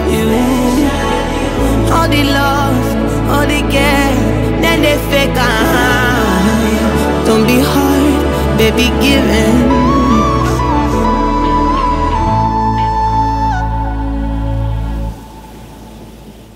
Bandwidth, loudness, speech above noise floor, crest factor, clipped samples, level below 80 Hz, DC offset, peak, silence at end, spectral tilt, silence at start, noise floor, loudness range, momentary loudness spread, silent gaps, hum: 16.5 kHz; -12 LUFS; 24 dB; 12 dB; under 0.1%; -20 dBFS; under 0.1%; 0 dBFS; 0.05 s; -5.5 dB/octave; 0 s; -33 dBFS; 4 LU; 7 LU; none; none